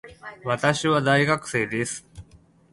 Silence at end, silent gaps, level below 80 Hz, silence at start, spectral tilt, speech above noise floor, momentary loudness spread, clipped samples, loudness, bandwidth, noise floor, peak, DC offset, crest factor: 0.5 s; none; -56 dBFS; 0.05 s; -4.5 dB/octave; 31 dB; 15 LU; under 0.1%; -23 LUFS; 11.5 kHz; -54 dBFS; -4 dBFS; under 0.1%; 20 dB